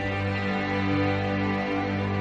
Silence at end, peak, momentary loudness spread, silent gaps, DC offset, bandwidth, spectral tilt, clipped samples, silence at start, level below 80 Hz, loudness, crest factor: 0 s; -12 dBFS; 2 LU; none; under 0.1%; 7.6 kHz; -7.5 dB/octave; under 0.1%; 0 s; -50 dBFS; -26 LUFS; 14 dB